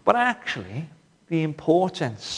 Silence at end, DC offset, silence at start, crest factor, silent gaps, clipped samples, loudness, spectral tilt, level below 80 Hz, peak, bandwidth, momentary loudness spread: 0 s; under 0.1%; 0.05 s; 22 dB; none; under 0.1%; -24 LUFS; -5.5 dB/octave; -64 dBFS; -2 dBFS; 10.5 kHz; 14 LU